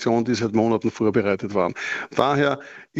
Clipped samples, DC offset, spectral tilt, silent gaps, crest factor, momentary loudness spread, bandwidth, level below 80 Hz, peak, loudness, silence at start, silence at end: under 0.1%; under 0.1%; -6 dB/octave; none; 20 dB; 5 LU; 8 kHz; -58 dBFS; -2 dBFS; -22 LUFS; 0 s; 0 s